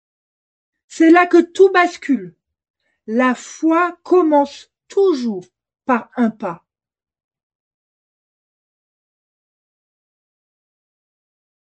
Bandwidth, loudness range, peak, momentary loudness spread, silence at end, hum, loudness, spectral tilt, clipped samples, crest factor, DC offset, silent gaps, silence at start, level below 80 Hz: 8.6 kHz; 10 LU; 0 dBFS; 13 LU; 5.1 s; none; -16 LUFS; -5 dB/octave; under 0.1%; 18 dB; under 0.1%; 2.70-2.74 s; 0.9 s; -72 dBFS